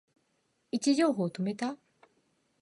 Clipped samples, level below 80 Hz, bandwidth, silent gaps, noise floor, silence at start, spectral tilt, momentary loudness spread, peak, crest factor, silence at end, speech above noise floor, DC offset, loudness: under 0.1%; -80 dBFS; 11.5 kHz; none; -75 dBFS; 0.75 s; -5 dB/octave; 11 LU; -16 dBFS; 18 dB; 0.85 s; 46 dB; under 0.1%; -30 LUFS